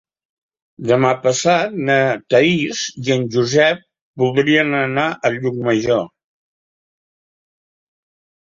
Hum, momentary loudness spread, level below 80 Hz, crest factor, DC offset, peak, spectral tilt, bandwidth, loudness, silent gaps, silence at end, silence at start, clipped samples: none; 7 LU; -58 dBFS; 18 dB; under 0.1%; -2 dBFS; -4.5 dB/octave; 7.8 kHz; -17 LUFS; 4.01-4.14 s; 2.5 s; 0.8 s; under 0.1%